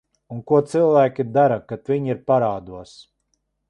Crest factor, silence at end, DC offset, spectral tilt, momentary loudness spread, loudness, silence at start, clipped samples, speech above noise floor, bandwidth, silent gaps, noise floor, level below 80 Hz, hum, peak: 16 dB; 0.85 s; under 0.1%; -8 dB/octave; 19 LU; -19 LUFS; 0.3 s; under 0.1%; 52 dB; 11 kHz; none; -72 dBFS; -58 dBFS; none; -4 dBFS